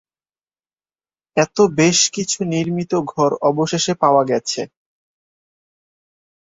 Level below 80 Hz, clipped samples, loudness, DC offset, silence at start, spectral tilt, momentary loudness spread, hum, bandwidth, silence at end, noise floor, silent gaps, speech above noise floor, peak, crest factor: -60 dBFS; under 0.1%; -17 LUFS; under 0.1%; 1.35 s; -4 dB/octave; 9 LU; none; 8 kHz; 1.9 s; under -90 dBFS; none; over 73 dB; -2 dBFS; 18 dB